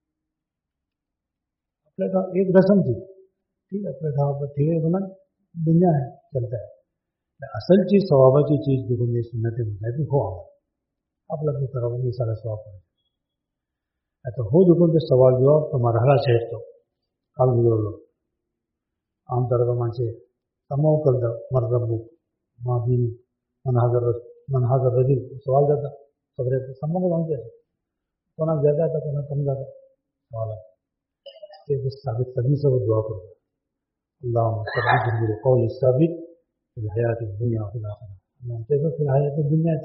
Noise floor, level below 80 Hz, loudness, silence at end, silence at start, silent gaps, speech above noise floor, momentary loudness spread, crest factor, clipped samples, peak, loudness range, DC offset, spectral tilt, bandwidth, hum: -85 dBFS; -56 dBFS; -22 LUFS; 0 s; 2 s; none; 64 dB; 16 LU; 20 dB; under 0.1%; -4 dBFS; 7 LU; under 0.1%; -8.5 dB/octave; 5.6 kHz; none